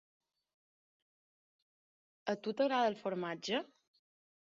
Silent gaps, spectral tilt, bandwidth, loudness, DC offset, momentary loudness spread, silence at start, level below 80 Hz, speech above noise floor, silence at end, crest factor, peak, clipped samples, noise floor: none; -2.5 dB/octave; 7.4 kHz; -37 LUFS; under 0.1%; 10 LU; 2.25 s; -86 dBFS; over 54 dB; 0.9 s; 20 dB; -20 dBFS; under 0.1%; under -90 dBFS